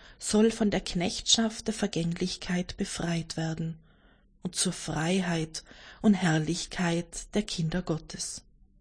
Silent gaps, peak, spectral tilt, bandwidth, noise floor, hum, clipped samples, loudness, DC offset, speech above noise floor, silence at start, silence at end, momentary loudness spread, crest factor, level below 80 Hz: none; -10 dBFS; -4 dB/octave; 10.5 kHz; -61 dBFS; none; under 0.1%; -29 LUFS; under 0.1%; 32 dB; 0 s; 0.4 s; 12 LU; 20 dB; -50 dBFS